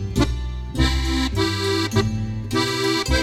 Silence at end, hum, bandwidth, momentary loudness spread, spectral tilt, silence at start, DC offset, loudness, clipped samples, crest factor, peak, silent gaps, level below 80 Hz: 0 s; none; 15.5 kHz; 5 LU; -5 dB/octave; 0 s; under 0.1%; -22 LUFS; under 0.1%; 16 dB; -4 dBFS; none; -28 dBFS